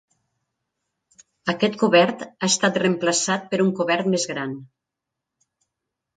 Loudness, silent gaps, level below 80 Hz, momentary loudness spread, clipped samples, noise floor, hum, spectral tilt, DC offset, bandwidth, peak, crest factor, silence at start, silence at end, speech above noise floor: -21 LUFS; none; -70 dBFS; 12 LU; under 0.1%; -84 dBFS; none; -3.5 dB/octave; under 0.1%; 9.6 kHz; -4 dBFS; 20 dB; 1.45 s; 1.55 s; 63 dB